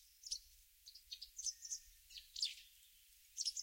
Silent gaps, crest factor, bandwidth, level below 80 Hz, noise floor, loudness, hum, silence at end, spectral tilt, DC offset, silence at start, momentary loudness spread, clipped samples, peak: none; 24 dB; 16.5 kHz; -76 dBFS; -68 dBFS; -46 LUFS; none; 0 s; 5.5 dB/octave; under 0.1%; 0 s; 21 LU; under 0.1%; -26 dBFS